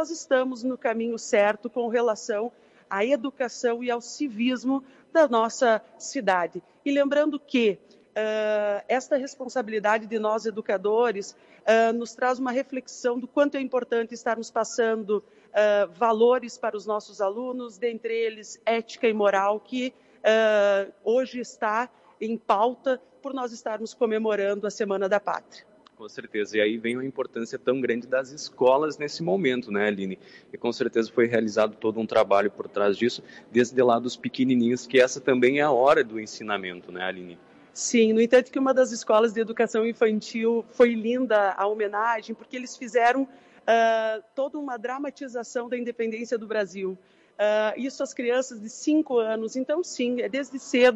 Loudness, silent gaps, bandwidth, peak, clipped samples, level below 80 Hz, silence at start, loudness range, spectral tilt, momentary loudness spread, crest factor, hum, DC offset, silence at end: -25 LUFS; none; 9.2 kHz; -8 dBFS; under 0.1%; -74 dBFS; 0 s; 5 LU; -4 dB/octave; 11 LU; 16 dB; none; under 0.1%; 0 s